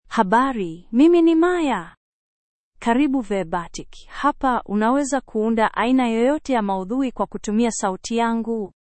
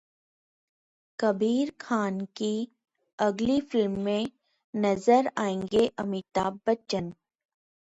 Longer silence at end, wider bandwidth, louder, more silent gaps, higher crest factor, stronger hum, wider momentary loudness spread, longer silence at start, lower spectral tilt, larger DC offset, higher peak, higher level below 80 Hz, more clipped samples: second, 0.2 s vs 0.8 s; second, 8.8 kHz vs 10.5 kHz; first, -20 LUFS vs -28 LUFS; first, 1.97-2.72 s vs 3.13-3.18 s, 4.64-4.73 s; about the same, 18 dB vs 20 dB; neither; about the same, 11 LU vs 10 LU; second, 0.1 s vs 1.2 s; about the same, -5 dB/octave vs -6 dB/octave; neither; first, -2 dBFS vs -10 dBFS; first, -46 dBFS vs -62 dBFS; neither